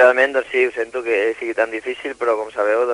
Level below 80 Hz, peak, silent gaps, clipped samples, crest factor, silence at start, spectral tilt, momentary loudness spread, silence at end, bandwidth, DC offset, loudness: -60 dBFS; 0 dBFS; none; under 0.1%; 18 dB; 0 s; -3 dB/octave; 6 LU; 0 s; 10.5 kHz; under 0.1%; -19 LUFS